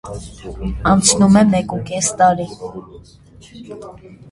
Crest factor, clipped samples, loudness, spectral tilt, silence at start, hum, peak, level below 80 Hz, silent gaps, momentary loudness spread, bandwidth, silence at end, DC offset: 18 dB; under 0.1%; -14 LUFS; -4.5 dB/octave; 0.05 s; none; 0 dBFS; -36 dBFS; none; 24 LU; 11.5 kHz; 0 s; under 0.1%